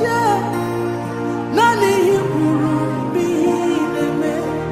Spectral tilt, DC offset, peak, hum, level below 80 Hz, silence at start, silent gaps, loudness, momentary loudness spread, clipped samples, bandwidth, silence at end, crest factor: -6 dB/octave; under 0.1%; -2 dBFS; none; -50 dBFS; 0 s; none; -18 LUFS; 7 LU; under 0.1%; 16 kHz; 0 s; 14 dB